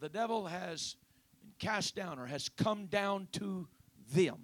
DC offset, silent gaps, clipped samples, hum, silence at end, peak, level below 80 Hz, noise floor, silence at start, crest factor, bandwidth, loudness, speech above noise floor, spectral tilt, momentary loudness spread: under 0.1%; none; under 0.1%; none; 0 s; -18 dBFS; -72 dBFS; -63 dBFS; 0 s; 20 dB; 19 kHz; -37 LUFS; 26 dB; -4.5 dB/octave; 9 LU